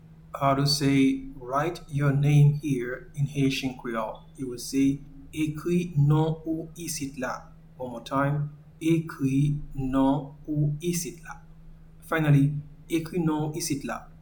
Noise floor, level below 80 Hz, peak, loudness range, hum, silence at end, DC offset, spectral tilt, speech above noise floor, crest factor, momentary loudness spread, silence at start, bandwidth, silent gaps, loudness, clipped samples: -47 dBFS; -48 dBFS; -10 dBFS; 4 LU; none; 0.05 s; under 0.1%; -6 dB/octave; 22 dB; 16 dB; 14 LU; 0.05 s; 19 kHz; none; -27 LUFS; under 0.1%